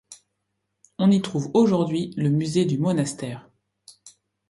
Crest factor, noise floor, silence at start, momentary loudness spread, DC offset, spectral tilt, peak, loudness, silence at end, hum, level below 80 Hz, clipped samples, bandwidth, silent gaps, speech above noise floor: 18 dB; -77 dBFS; 0.1 s; 11 LU; under 0.1%; -7 dB/octave; -6 dBFS; -22 LUFS; 0.4 s; none; -64 dBFS; under 0.1%; 11.5 kHz; none; 56 dB